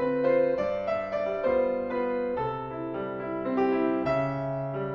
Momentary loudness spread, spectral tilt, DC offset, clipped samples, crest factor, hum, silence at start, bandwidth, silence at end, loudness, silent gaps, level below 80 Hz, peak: 8 LU; -9 dB/octave; under 0.1%; under 0.1%; 14 dB; none; 0 s; 6.4 kHz; 0 s; -28 LUFS; none; -56 dBFS; -14 dBFS